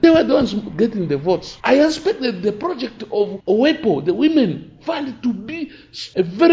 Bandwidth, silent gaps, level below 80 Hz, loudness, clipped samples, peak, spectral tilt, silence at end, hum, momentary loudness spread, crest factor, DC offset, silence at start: 7.8 kHz; none; -50 dBFS; -19 LUFS; under 0.1%; 0 dBFS; -6 dB/octave; 0 s; none; 12 LU; 18 dB; under 0.1%; 0 s